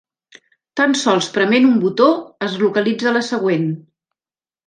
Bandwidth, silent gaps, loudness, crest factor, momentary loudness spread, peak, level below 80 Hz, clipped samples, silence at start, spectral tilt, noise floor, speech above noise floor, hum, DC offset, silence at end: 9.8 kHz; none; -16 LUFS; 16 dB; 10 LU; -2 dBFS; -68 dBFS; under 0.1%; 0.75 s; -5 dB/octave; under -90 dBFS; over 74 dB; none; under 0.1%; 0.9 s